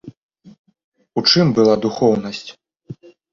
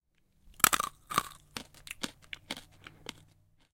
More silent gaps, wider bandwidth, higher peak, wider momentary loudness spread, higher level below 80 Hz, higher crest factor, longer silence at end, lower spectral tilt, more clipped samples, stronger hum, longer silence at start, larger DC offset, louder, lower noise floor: first, 0.17-0.29 s, 0.59-0.65 s, 0.84-0.92 s vs none; second, 7.4 kHz vs 17 kHz; about the same, 0 dBFS vs -2 dBFS; first, 26 LU vs 21 LU; first, -54 dBFS vs -62 dBFS; second, 18 dB vs 36 dB; second, 0.4 s vs 1.1 s; first, -5.5 dB/octave vs -0.5 dB/octave; neither; neither; second, 0.05 s vs 0.65 s; neither; first, -16 LUFS vs -32 LUFS; second, -38 dBFS vs -65 dBFS